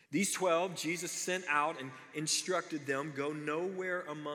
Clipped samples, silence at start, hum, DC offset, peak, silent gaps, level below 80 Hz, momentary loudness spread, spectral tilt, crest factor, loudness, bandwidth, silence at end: under 0.1%; 0.1 s; none; under 0.1%; -18 dBFS; none; under -90 dBFS; 7 LU; -3 dB/octave; 18 dB; -35 LUFS; 19 kHz; 0 s